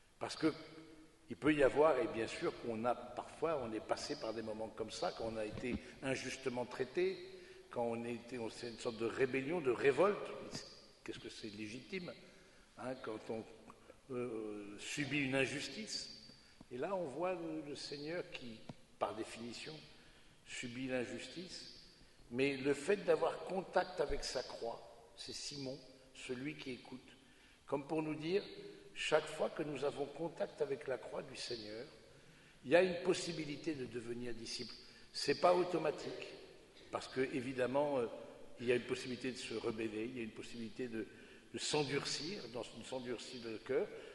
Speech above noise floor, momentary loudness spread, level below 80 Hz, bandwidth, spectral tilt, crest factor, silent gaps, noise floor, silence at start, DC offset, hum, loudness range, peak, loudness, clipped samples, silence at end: 25 dB; 17 LU; -64 dBFS; 11.5 kHz; -4.5 dB/octave; 24 dB; none; -65 dBFS; 0.2 s; under 0.1%; none; 8 LU; -16 dBFS; -40 LUFS; under 0.1%; 0 s